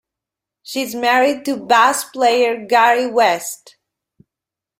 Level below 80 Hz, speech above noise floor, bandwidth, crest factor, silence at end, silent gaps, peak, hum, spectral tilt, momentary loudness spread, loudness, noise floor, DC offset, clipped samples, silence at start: -68 dBFS; 71 dB; 16.5 kHz; 16 dB; 1.25 s; none; -2 dBFS; none; -2 dB/octave; 11 LU; -15 LUFS; -86 dBFS; under 0.1%; under 0.1%; 0.65 s